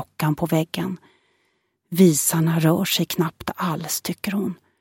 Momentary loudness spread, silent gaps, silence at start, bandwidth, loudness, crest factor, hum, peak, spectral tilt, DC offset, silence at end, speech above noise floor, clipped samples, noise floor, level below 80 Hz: 12 LU; none; 0 s; 17 kHz; -22 LUFS; 18 dB; none; -4 dBFS; -5 dB/octave; under 0.1%; 0.25 s; 48 dB; under 0.1%; -69 dBFS; -58 dBFS